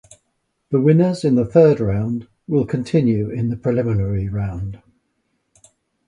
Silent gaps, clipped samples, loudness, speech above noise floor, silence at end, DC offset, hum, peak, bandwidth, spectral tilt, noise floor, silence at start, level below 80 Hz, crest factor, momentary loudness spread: none; under 0.1%; -18 LUFS; 54 dB; 1.3 s; under 0.1%; none; 0 dBFS; 10.5 kHz; -9 dB/octave; -71 dBFS; 0.7 s; -42 dBFS; 18 dB; 12 LU